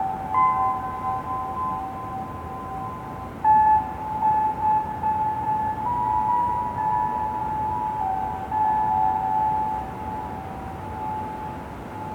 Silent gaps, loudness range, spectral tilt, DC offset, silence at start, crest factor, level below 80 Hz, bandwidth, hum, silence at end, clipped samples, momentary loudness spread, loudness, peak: none; 4 LU; -7 dB/octave; under 0.1%; 0 s; 16 dB; -46 dBFS; 17 kHz; none; 0 s; under 0.1%; 12 LU; -25 LUFS; -10 dBFS